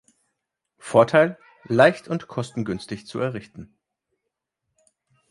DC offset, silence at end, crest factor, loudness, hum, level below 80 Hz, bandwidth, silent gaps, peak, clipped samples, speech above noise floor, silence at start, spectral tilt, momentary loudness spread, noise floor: under 0.1%; 1.65 s; 24 dB; -22 LUFS; none; -60 dBFS; 11.5 kHz; none; -2 dBFS; under 0.1%; 60 dB; 0.85 s; -6 dB/octave; 15 LU; -82 dBFS